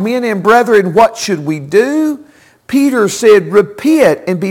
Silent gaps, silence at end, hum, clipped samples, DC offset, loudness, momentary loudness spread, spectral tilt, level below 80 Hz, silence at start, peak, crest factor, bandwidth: none; 0 s; none; under 0.1%; under 0.1%; -11 LUFS; 9 LU; -5 dB/octave; -52 dBFS; 0 s; 0 dBFS; 10 dB; 17 kHz